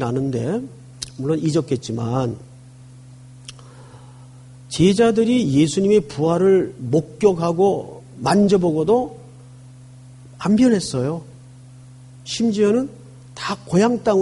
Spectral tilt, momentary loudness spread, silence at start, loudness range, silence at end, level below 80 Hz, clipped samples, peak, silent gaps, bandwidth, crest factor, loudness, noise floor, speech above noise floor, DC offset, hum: -6.5 dB/octave; 17 LU; 0 s; 8 LU; 0 s; -52 dBFS; under 0.1%; -4 dBFS; none; 11.5 kHz; 16 dB; -19 LUFS; -42 dBFS; 25 dB; under 0.1%; none